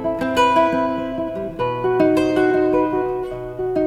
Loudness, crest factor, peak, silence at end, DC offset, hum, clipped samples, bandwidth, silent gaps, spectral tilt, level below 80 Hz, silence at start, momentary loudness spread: -19 LUFS; 14 dB; -4 dBFS; 0 s; under 0.1%; none; under 0.1%; 13.5 kHz; none; -6 dB/octave; -44 dBFS; 0 s; 10 LU